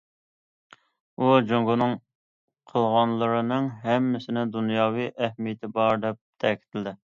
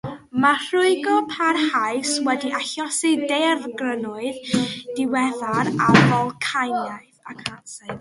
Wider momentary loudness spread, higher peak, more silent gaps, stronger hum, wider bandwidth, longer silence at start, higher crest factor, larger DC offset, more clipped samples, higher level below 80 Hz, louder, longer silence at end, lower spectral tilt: second, 10 LU vs 14 LU; second, -6 dBFS vs 0 dBFS; first, 2.15-2.48 s, 6.21-6.33 s vs none; neither; second, 7.2 kHz vs 11.5 kHz; first, 1.2 s vs 0.05 s; about the same, 20 dB vs 20 dB; neither; neither; second, -68 dBFS vs -56 dBFS; second, -25 LUFS vs -21 LUFS; first, 0.15 s vs 0 s; first, -8 dB/octave vs -4.5 dB/octave